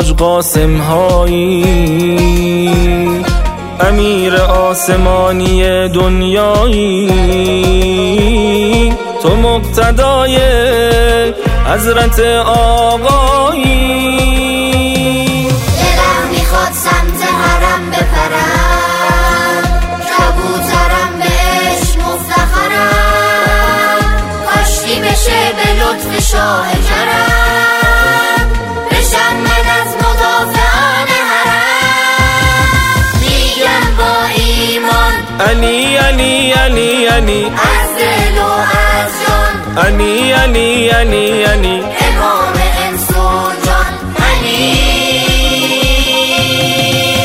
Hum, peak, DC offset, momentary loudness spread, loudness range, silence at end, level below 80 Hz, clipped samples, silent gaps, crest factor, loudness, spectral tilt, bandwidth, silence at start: none; 0 dBFS; under 0.1%; 3 LU; 2 LU; 0 s; -16 dBFS; 0.2%; none; 10 dB; -10 LUFS; -4 dB/octave; 16.5 kHz; 0 s